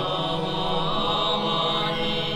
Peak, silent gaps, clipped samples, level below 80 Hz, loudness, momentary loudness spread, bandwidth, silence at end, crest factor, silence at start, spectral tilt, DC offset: -10 dBFS; none; under 0.1%; -42 dBFS; -24 LUFS; 3 LU; 13.5 kHz; 0 s; 14 dB; 0 s; -5 dB/octave; under 0.1%